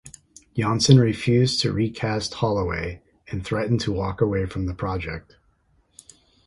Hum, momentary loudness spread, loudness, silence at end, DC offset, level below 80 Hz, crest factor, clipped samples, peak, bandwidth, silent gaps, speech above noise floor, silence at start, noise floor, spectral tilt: none; 17 LU; -23 LUFS; 1.25 s; under 0.1%; -42 dBFS; 22 dB; under 0.1%; 0 dBFS; 11.5 kHz; none; 41 dB; 0.05 s; -63 dBFS; -5.5 dB/octave